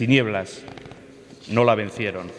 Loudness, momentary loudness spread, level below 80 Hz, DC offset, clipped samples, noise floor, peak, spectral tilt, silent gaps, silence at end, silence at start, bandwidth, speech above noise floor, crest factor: -22 LUFS; 23 LU; -60 dBFS; under 0.1%; under 0.1%; -45 dBFS; -4 dBFS; -6.5 dB/octave; none; 0 s; 0 s; 10.5 kHz; 23 dB; 20 dB